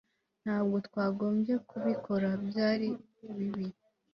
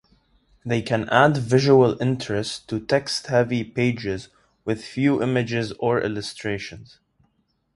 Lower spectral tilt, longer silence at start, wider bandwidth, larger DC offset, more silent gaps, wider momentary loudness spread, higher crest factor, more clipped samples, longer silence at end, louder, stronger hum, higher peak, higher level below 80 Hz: first, -8.5 dB/octave vs -6 dB/octave; second, 0.45 s vs 0.65 s; second, 6 kHz vs 11.5 kHz; neither; neither; second, 10 LU vs 13 LU; second, 16 dB vs 22 dB; neither; second, 0.45 s vs 0.9 s; second, -33 LUFS vs -22 LUFS; neither; second, -18 dBFS vs 0 dBFS; second, -72 dBFS vs -54 dBFS